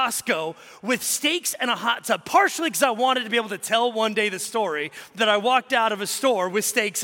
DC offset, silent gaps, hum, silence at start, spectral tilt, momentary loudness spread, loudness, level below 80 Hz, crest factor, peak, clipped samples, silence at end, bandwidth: under 0.1%; none; none; 0 s; -1.5 dB/octave; 6 LU; -22 LUFS; -76 dBFS; 18 dB; -6 dBFS; under 0.1%; 0 s; 17 kHz